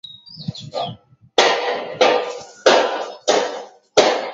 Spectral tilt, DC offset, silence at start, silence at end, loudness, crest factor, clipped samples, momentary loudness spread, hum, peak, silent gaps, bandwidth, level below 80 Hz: -2.5 dB/octave; under 0.1%; 0.1 s; 0 s; -18 LUFS; 20 dB; under 0.1%; 16 LU; none; 0 dBFS; none; 8 kHz; -62 dBFS